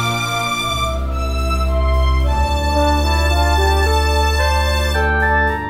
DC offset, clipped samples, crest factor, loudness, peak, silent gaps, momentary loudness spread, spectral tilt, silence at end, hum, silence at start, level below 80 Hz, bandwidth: under 0.1%; under 0.1%; 12 dB; -17 LUFS; -4 dBFS; none; 4 LU; -4.5 dB/octave; 0 s; none; 0 s; -18 dBFS; 16 kHz